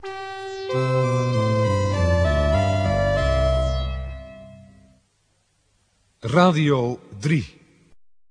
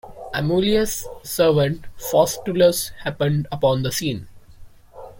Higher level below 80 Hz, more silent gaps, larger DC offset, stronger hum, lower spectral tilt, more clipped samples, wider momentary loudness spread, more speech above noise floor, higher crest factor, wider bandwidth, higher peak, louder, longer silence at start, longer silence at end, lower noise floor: first, -32 dBFS vs -44 dBFS; neither; neither; neither; first, -7 dB/octave vs -5 dB/octave; neither; first, 15 LU vs 11 LU; first, 47 dB vs 23 dB; about the same, 20 dB vs 18 dB; second, 10.5 kHz vs 17 kHz; about the same, -2 dBFS vs -4 dBFS; about the same, -21 LUFS vs -21 LUFS; about the same, 0 s vs 0.05 s; first, 0.35 s vs 0 s; first, -66 dBFS vs -43 dBFS